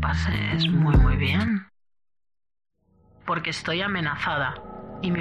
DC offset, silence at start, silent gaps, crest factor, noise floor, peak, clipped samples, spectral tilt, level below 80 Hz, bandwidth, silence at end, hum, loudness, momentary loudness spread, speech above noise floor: under 0.1%; 0 s; none; 16 dB; -58 dBFS; -8 dBFS; under 0.1%; -6.5 dB/octave; -32 dBFS; 10 kHz; 0 s; none; -24 LUFS; 11 LU; 35 dB